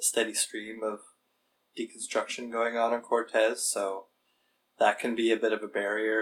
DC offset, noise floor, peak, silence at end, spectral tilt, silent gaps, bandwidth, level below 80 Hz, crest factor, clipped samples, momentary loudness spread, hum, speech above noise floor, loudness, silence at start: under 0.1%; -75 dBFS; -10 dBFS; 0 s; -1.5 dB/octave; none; 19 kHz; -88 dBFS; 22 dB; under 0.1%; 11 LU; none; 46 dB; -29 LUFS; 0 s